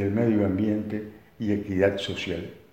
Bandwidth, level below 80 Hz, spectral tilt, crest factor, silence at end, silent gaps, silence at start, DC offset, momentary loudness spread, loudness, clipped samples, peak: 15.5 kHz; -56 dBFS; -7 dB/octave; 18 dB; 0.15 s; none; 0 s; under 0.1%; 11 LU; -27 LUFS; under 0.1%; -8 dBFS